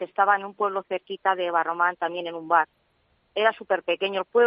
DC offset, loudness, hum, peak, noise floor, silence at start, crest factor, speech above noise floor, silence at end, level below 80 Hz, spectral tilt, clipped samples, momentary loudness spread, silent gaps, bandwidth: under 0.1%; -25 LUFS; none; -6 dBFS; -67 dBFS; 0 s; 20 dB; 43 dB; 0 s; -78 dBFS; -0.5 dB/octave; under 0.1%; 9 LU; none; 5.4 kHz